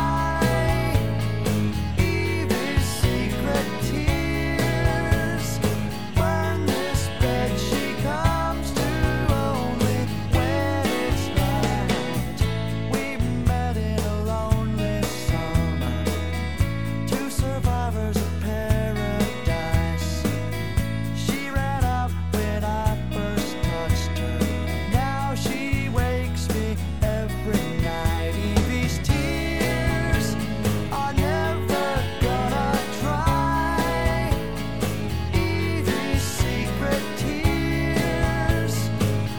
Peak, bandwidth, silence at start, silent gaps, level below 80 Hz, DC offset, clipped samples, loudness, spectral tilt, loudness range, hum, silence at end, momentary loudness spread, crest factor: -6 dBFS; over 20 kHz; 0 s; none; -30 dBFS; 2%; under 0.1%; -24 LUFS; -5.5 dB/octave; 2 LU; none; 0 s; 3 LU; 16 dB